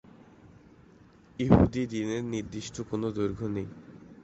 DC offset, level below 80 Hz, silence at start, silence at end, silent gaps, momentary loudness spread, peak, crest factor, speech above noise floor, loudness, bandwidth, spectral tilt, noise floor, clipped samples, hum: under 0.1%; -46 dBFS; 0.45 s; 0.1 s; none; 21 LU; -4 dBFS; 26 dB; 28 dB; -29 LUFS; 8.2 kHz; -7 dB/octave; -56 dBFS; under 0.1%; none